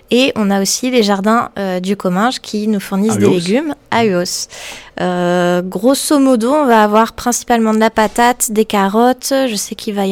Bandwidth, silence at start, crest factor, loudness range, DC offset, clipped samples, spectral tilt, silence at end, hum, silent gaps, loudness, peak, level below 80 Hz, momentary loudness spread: 18 kHz; 0.1 s; 12 dB; 3 LU; under 0.1%; under 0.1%; -4.5 dB/octave; 0 s; none; none; -14 LUFS; 0 dBFS; -48 dBFS; 8 LU